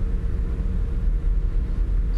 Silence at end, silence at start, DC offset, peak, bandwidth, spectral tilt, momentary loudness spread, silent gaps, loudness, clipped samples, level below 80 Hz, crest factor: 0 s; 0 s; under 0.1%; -12 dBFS; 3 kHz; -9 dB/octave; 1 LU; none; -27 LUFS; under 0.1%; -22 dBFS; 8 dB